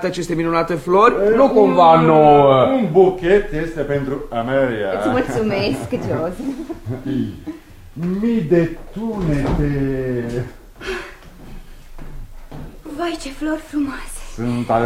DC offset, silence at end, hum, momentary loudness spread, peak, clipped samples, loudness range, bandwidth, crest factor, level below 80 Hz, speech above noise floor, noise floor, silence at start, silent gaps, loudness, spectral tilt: under 0.1%; 0 s; none; 18 LU; 0 dBFS; under 0.1%; 15 LU; 15.5 kHz; 18 dB; -34 dBFS; 21 dB; -37 dBFS; 0 s; none; -17 LUFS; -7 dB/octave